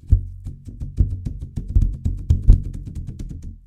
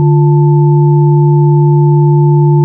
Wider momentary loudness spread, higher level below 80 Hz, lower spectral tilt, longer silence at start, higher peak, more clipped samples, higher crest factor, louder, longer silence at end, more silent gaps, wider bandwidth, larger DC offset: first, 17 LU vs 0 LU; first, -22 dBFS vs -54 dBFS; second, -9.5 dB/octave vs -15.5 dB/octave; about the same, 0.05 s vs 0 s; about the same, 0 dBFS vs 0 dBFS; neither; first, 20 dB vs 6 dB; second, -23 LUFS vs -8 LUFS; about the same, 0.05 s vs 0 s; neither; about the same, 1.1 kHz vs 1 kHz; neither